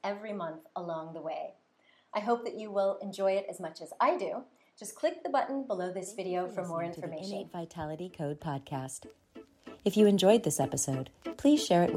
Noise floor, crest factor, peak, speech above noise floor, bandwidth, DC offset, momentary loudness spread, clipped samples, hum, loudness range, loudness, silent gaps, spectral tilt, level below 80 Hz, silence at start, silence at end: -58 dBFS; 22 dB; -10 dBFS; 26 dB; 16 kHz; under 0.1%; 16 LU; under 0.1%; none; 8 LU; -32 LUFS; none; -5 dB/octave; -70 dBFS; 0.05 s; 0 s